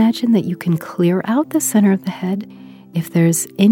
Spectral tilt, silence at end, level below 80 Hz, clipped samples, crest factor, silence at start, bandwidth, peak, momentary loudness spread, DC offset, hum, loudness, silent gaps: -6 dB/octave; 0 s; -68 dBFS; under 0.1%; 16 dB; 0 s; 17.5 kHz; 0 dBFS; 10 LU; under 0.1%; none; -17 LUFS; none